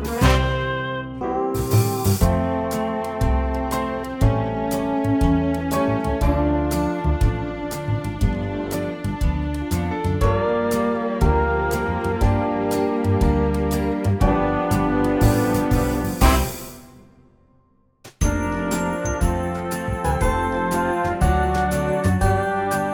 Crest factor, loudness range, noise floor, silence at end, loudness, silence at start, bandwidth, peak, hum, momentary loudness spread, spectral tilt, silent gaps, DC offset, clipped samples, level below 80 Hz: 18 dB; 4 LU; -59 dBFS; 0 s; -21 LUFS; 0 s; 19.5 kHz; -2 dBFS; none; 6 LU; -6.5 dB/octave; none; under 0.1%; under 0.1%; -26 dBFS